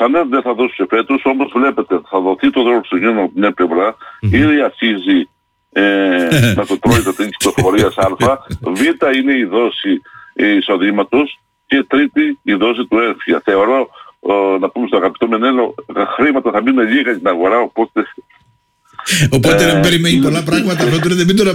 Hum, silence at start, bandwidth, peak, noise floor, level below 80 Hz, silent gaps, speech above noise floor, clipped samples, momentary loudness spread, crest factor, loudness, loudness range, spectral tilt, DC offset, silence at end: none; 0 s; 16.5 kHz; -2 dBFS; -56 dBFS; -40 dBFS; none; 43 dB; under 0.1%; 7 LU; 10 dB; -13 LUFS; 1 LU; -5.5 dB/octave; under 0.1%; 0 s